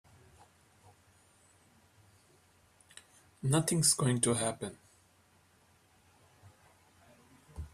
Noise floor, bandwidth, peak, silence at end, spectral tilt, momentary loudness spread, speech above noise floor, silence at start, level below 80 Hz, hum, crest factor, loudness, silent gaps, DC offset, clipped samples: -67 dBFS; 15 kHz; -14 dBFS; 0.05 s; -4 dB/octave; 28 LU; 36 dB; 3.45 s; -62 dBFS; none; 24 dB; -30 LUFS; none; under 0.1%; under 0.1%